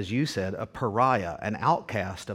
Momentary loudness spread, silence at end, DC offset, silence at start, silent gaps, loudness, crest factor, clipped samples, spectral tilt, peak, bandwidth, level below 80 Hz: 8 LU; 0 s; under 0.1%; 0 s; none; -27 LUFS; 18 dB; under 0.1%; -6 dB/octave; -10 dBFS; 16 kHz; -58 dBFS